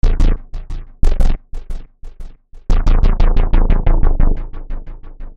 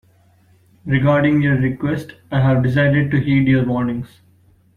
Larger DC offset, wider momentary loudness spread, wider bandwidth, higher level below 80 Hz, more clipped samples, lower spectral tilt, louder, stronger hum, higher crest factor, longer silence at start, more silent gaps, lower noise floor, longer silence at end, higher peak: first, 0.8% vs under 0.1%; first, 21 LU vs 10 LU; first, 5 kHz vs 4.4 kHz; first, -12 dBFS vs -44 dBFS; neither; second, -7.5 dB/octave vs -9 dB/octave; about the same, -19 LUFS vs -17 LUFS; neither; about the same, 12 dB vs 14 dB; second, 0.05 s vs 0.85 s; neither; second, -31 dBFS vs -53 dBFS; second, 0.05 s vs 0.7 s; first, 0 dBFS vs -4 dBFS